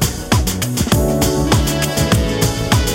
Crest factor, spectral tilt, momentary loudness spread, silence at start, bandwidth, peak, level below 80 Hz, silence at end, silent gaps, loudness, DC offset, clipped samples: 14 dB; -4.5 dB/octave; 3 LU; 0 s; 16.5 kHz; 0 dBFS; -24 dBFS; 0 s; none; -16 LUFS; under 0.1%; under 0.1%